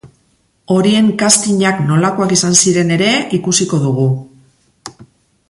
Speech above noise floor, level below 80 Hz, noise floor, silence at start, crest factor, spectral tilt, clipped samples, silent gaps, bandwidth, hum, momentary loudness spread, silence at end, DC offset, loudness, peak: 45 dB; -52 dBFS; -58 dBFS; 0.05 s; 14 dB; -4 dB/octave; under 0.1%; none; 11.5 kHz; none; 6 LU; 0.45 s; under 0.1%; -12 LUFS; 0 dBFS